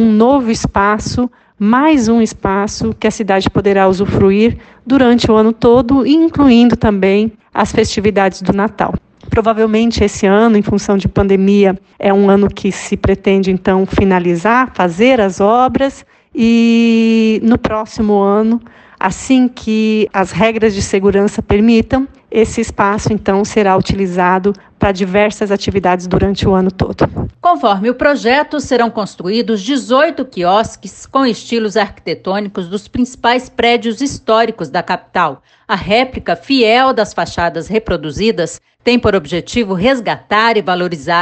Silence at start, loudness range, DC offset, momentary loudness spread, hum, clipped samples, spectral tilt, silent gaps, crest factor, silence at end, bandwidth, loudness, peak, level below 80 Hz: 0 s; 4 LU; under 0.1%; 8 LU; none; under 0.1%; -5.5 dB/octave; none; 12 dB; 0 s; 8.8 kHz; -13 LUFS; 0 dBFS; -34 dBFS